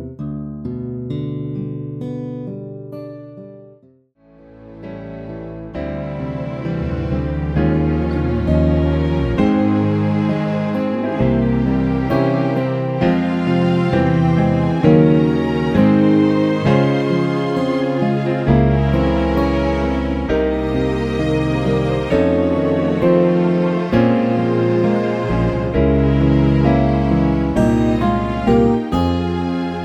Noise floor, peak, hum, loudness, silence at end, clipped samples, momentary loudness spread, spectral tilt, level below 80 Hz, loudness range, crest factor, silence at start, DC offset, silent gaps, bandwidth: -52 dBFS; 0 dBFS; none; -17 LUFS; 0 s; under 0.1%; 13 LU; -9 dB/octave; -30 dBFS; 13 LU; 16 dB; 0 s; under 0.1%; none; 8.6 kHz